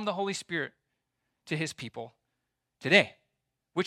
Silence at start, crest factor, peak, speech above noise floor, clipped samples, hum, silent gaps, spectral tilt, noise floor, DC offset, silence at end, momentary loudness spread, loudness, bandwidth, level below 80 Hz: 0 s; 26 dB; -6 dBFS; 54 dB; under 0.1%; none; none; -4 dB/octave; -83 dBFS; under 0.1%; 0 s; 18 LU; -29 LUFS; 15 kHz; -76 dBFS